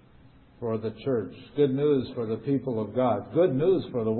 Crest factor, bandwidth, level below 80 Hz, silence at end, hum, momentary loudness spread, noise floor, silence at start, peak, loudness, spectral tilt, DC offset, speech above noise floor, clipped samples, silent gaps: 16 dB; 4.4 kHz; -60 dBFS; 0 s; none; 9 LU; -54 dBFS; 0.6 s; -12 dBFS; -27 LUFS; -12 dB/octave; under 0.1%; 28 dB; under 0.1%; none